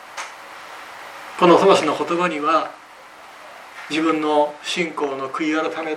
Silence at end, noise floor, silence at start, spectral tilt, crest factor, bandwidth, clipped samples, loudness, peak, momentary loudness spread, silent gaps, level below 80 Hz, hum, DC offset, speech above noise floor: 0 s; -42 dBFS; 0 s; -4.5 dB/octave; 20 dB; 14.5 kHz; under 0.1%; -19 LUFS; 0 dBFS; 22 LU; none; -70 dBFS; none; under 0.1%; 24 dB